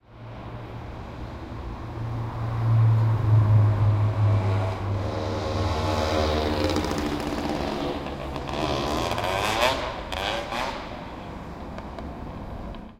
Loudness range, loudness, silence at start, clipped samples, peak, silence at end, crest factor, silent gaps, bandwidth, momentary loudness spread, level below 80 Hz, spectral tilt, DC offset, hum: 5 LU; -25 LUFS; 0.1 s; under 0.1%; -4 dBFS; 0.05 s; 22 dB; none; 14 kHz; 17 LU; -38 dBFS; -6.5 dB/octave; under 0.1%; none